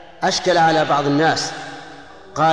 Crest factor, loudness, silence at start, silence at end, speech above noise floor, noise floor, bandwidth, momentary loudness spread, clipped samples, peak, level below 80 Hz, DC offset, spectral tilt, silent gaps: 12 dB; -17 LUFS; 0 s; 0 s; 23 dB; -40 dBFS; 10.5 kHz; 19 LU; under 0.1%; -6 dBFS; -54 dBFS; 0.5%; -4 dB/octave; none